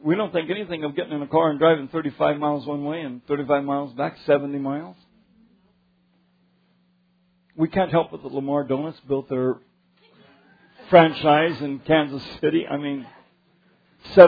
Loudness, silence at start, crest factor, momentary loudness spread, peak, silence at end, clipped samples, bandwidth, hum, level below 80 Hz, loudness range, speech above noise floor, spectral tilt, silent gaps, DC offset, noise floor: -23 LUFS; 0 s; 22 dB; 11 LU; 0 dBFS; 0 s; under 0.1%; 5 kHz; none; -60 dBFS; 8 LU; 42 dB; -9 dB/octave; none; under 0.1%; -64 dBFS